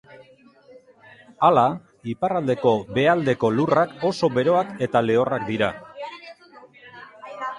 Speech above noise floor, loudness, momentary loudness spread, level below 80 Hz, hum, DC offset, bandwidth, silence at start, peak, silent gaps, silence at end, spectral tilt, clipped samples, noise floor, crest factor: 31 dB; -21 LUFS; 17 LU; -60 dBFS; none; under 0.1%; 11 kHz; 0.2 s; -4 dBFS; none; 0 s; -7 dB/octave; under 0.1%; -52 dBFS; 18 dB